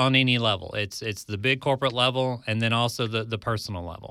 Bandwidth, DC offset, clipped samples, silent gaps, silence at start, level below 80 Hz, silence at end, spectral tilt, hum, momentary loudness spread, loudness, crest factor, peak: 15 kHz; under 0.1%; under 0.1%; none; 0 s; -56 dBFS; 0 s; -5 dB/octave; none; 9 LU; -25 LUFS; 18 dB; -6 dBFS